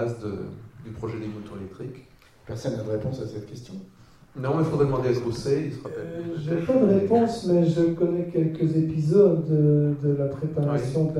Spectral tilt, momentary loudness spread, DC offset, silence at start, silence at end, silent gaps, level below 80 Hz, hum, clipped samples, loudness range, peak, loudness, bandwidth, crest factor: -8.5 dB/octave; 19 LU; under 0.1%; 0 s; 0 s; none; -54 dBFS; none; under 0.1%; 12 LU; -6 dBFS; -24 LUFS; 11 kHz; 18 dB